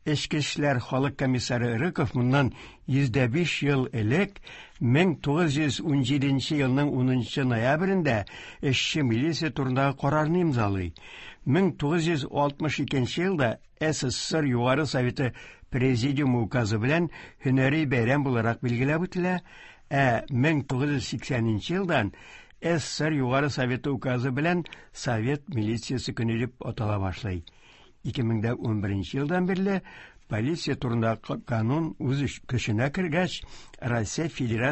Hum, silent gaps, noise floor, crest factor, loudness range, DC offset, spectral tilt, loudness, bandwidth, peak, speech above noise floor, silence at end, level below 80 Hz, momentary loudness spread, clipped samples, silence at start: none; none; -47 dBFS; 18 dB; 4 LU; under 0.1%; -6 dB/octave; -27 LUFS; 8.6 kHz; -8 dBFS; 21 dB; 0 s; -50 dBFS; 7 LU; under 0.1%; 0.05 s